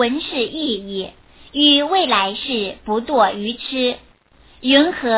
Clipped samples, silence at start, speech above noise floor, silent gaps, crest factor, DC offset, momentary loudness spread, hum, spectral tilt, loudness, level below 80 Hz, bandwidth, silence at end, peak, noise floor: under 0.1%; 0 s; 33 dB; none; 18 dB; under 0.1%; 14 LU; none; -8 dB/octave; -17 LUFS; -52 dBFS; 4 kHz; 0 s; 0 dBFS; -51 dBFS